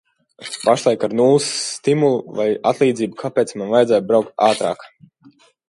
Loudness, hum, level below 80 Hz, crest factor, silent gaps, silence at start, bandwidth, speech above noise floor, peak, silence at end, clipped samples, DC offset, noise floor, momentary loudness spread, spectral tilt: -18 LUFS; none; -66 dBFS; 18 dB; none; 0.4 s; 11.5 kHz; 34 dB; 0 dBFS; 0.8 s; under 0.1%; under 0.1%; -51 dBFS; 7 LU; -4.5 dB/octave